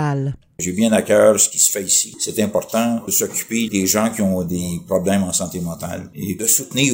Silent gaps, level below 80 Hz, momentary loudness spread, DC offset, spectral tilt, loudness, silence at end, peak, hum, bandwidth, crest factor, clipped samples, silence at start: none; -52 dBFS; 13 LU; under 0.1%; -3.5 dB/octave; -17 LUFS; 0 s; 0 dBFS; none; 16.5 kHz; 18 dB; under 0.1%; 0 s